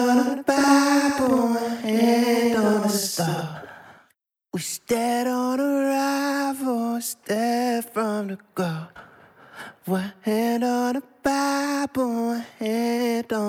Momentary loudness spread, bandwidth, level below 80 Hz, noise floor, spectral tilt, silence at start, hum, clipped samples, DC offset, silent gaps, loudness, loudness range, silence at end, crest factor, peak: 10 LU; 16.5 kHz; -64 dBFS; -67 dBFS; -4.5 dB/octave; 0 s; none; under 0.1%; under 0.1%; none; -23 LUFS; 7 LU; 0 s; 18 dB; -6 dBFS